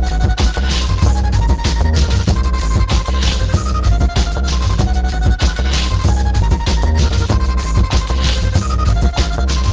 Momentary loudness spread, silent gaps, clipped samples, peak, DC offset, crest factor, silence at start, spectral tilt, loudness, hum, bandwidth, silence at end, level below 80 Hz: 2 LU; none; under 0.1%; -2 dBFS; under 0.1%; 12 dB; 0 s; -5 dB/octave; -16 LUFS; none; 8 kHz; 0 s; -14 dBFS